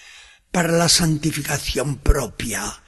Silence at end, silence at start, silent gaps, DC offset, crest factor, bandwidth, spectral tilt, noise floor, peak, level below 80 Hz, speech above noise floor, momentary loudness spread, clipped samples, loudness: 0.1 s; 0.05 s; none; under 0.1%; 18 dB; 13 kHz; -3.5 dB/octave; -46 dBFS; -2 dBFS; -30 dBFS; 26 dB; 10 LU; under 0.1%; -20 LUFS